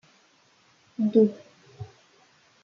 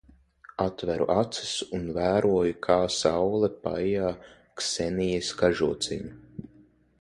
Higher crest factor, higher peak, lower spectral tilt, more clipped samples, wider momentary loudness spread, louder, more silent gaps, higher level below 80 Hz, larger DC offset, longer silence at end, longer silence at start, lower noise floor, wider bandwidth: about the same, 20 dB vs 20 dB; about the same, -8 dBFS vs -6 dBFS; first, -9 dB/octave vs -4.5 dB/octave; neither; first, 24 LU vs 16 LU; first, -23 LUFS vs -27 LUFS; neither; second, -72 dBFS vs -52 dBFS; neither; first, 0.8 s vs 0.6 s; first, 1 s vs 0.6 s; first, -62 dBFS vs -58 dBFS; second, 7 kHz vs 11.5 kHz